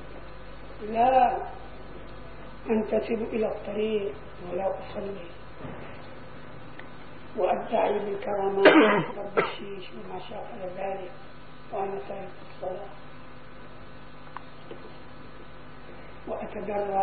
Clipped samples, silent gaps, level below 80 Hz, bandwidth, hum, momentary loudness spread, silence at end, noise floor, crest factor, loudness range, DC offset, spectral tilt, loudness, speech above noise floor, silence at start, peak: under 0.1%; none; -52 dBFS; 4.8 kHz; none; 24 LU; 0 s; -47 dBFS; 26 dB; 18 LU; 0.9%; -9.5 dB/octave; -27 LUFS; 20 dB; 0 s; -4 dBFS